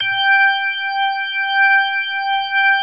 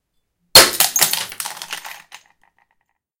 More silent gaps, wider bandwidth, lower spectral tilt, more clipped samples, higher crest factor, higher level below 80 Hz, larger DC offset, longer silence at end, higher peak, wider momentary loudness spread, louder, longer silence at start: neither; second, 5 kHz vs over 20 kHz; about the same, -0.5 dB/octave vs 0.5 dB/octave; second, under 0.1% vs 0.3%; second, 12 dB vs 20 dB; second, -74 dBFS vs -52 dBFS; first, 0.2% vs under 0.1%; second, 0 s vs 1.25 s; second, -4 dBFS vs 0 dBFS; second, 6 LU vs 21 LU; second, -15 LUFS vs -11 LUFS; second, 0 s vs 0.55 s